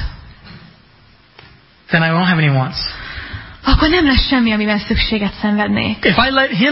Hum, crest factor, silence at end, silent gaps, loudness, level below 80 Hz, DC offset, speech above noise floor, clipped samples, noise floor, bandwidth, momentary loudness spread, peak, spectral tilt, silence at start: none; 16 dB; 0 s; none; -14 LUFS; -26 dBFS; under 0.1%; 34 dB; under 0.1%; -48 dBFS; 5.8 kHz; 12 LU; 0 dBFS; -9.5 dB/octave; 0 s